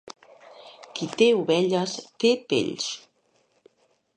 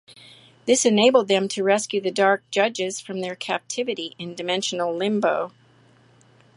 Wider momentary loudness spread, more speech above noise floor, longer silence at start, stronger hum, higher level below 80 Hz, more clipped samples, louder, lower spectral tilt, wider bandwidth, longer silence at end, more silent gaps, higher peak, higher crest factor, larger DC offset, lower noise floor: first, 18 LU vs 13 LU; first, 43 dB vs 33 dB; about the same, 0.05 s vs 0.1 s; neither; about the same, -74 dBFS vs -76 dBFS; neither; about the same, -24 LUFS vs -22 LUFS; about the same, -4 dB/octave vs -3 dB/octave; second, 9.8 kHz vs 11.5 kHz; about the same, 1.2 s vs 1.1 s; neither; second, -8 dBFS vs -4 dBFS; about the same, 18 dB vs 20 dB; neither; first, -67 dBFS vs -55 dBFS